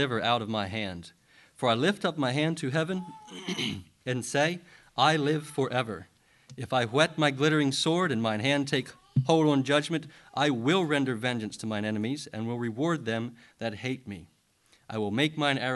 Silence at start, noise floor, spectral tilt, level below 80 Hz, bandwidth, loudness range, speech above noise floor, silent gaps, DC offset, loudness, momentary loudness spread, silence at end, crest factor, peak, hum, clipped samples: 0 s; -65 dBFS; -5 dB/octave; -64 dBFS; 12.5 kHz; 6 LU; 37 dB; none; under 0.1%; -28 LUFS; 13 LU; 0 s; 20 dB; -8 dBFS; none; under 0.1%